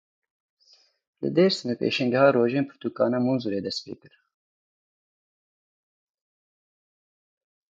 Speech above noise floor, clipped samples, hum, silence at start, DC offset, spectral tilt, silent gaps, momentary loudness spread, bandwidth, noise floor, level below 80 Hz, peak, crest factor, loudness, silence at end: 37 dB; under 0.1%; none; 1.2 s; under 0.1%; -6 dB/octave; none; 13 LU; 7.8 kHz; -61 dBFS; -72 dBFS; -6 dBFS; 22 dB; -24 LUFS; 3.75 s